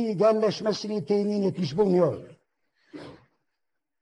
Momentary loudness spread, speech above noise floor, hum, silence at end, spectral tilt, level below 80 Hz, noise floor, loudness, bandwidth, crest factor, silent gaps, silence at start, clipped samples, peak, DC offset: 20 LU; 60 dB; none; 0.85 s; -7 dB/octave; -66 dBFS; -84 dBFS; -25 LUFS; 10 kHz; 16 dB; none; 0 s; under 0.1%; -10 dBFS; under 0.1%